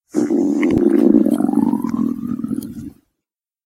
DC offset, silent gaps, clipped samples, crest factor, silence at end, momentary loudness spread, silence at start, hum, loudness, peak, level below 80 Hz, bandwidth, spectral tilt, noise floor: under 0.1%; none; under 0.1%; 18 dB; 0.75 s; 14 LU; 0.15 s; none; -17 LUFS; 0 dBFS; -48 dBFS; 15.5 kHz; -8 dB/octave; -83 dBFS